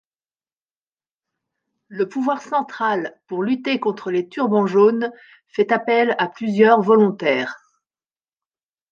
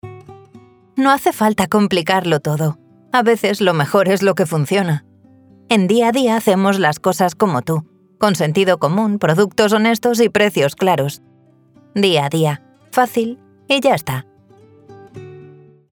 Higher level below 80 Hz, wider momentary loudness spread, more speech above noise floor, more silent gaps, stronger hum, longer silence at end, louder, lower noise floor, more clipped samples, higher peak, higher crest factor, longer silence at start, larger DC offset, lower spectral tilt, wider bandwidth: second, -72 dBFS vs -58 dBFS; about the same, 11 LU vs 10 LU; first, over 71 dB vs 35 dB; neither; neither; first, 1.35 s vs 0.45 s; second, -19 LUFS vs -16 LUFS; first, under -90 dBFS vs -50 dBFS; neither; about the same, -2 dBFS vs 0 dBFS; about the same, 18 dB vs 16 dB; first, 1.9 s vs 0.05 s; neither; first, -7 dB/octave vs -5.5 dB/octave; second, 7.2 kHz vs over 20 kHz